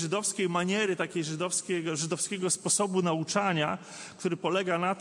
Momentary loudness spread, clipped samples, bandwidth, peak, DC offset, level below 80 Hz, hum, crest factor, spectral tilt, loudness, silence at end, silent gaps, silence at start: 6 LU; under 0.1%; 11.5 kHz; -14 dBFS; under 0.1%; -76 dBFS; none; 16 dB; -3.5 dB/octave; -29 LUFS; 0 s; none; 0 s